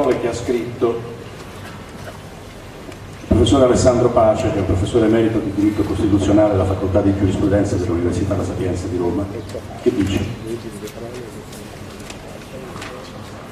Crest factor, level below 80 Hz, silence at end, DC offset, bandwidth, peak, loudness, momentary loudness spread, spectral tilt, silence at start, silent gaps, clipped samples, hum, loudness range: 18 dB; -36 dBFS; 0 s; under 0.1%; 14.5 kHz; 0 dBFS; -18 LUFS; 20 LU; -6.5 dB/octave; 0 s; none; under 0.1%; none; 10 LU